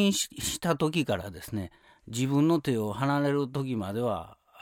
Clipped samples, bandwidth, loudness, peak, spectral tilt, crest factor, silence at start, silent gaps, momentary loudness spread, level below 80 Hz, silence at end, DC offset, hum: under 0.1%; 17.5 kHz; -29 LUFS; -12 dBFS; -5 dB/octave; 16 dB; 0 s; none; 11 LU; -58 dBFS; 0.3 s; under 0.1%; none